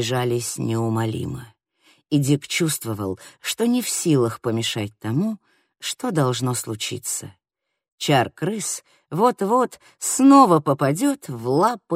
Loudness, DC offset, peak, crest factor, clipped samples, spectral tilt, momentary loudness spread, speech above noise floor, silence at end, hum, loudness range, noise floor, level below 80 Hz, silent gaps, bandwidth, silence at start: -21 LUFS; under 0.1%; -2 dBFS; 20 dB; under 0.1%; -5 dB/octave; 11 LU; 39 dB; 0 s; none; 6 LU; -60 dBFS; -60 dBFS; 7.92-7.98 s; 16 kHz; 0 s